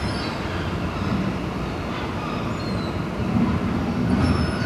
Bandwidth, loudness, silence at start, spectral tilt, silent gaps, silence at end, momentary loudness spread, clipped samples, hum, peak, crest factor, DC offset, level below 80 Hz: 13 kHz; -25 LUFS; 0 s; -7 dB/octave; none; 0 s; 6 LU; under 0.1%; none; -8 dBFS; 16 dB; under 0.1%; -36 dBFS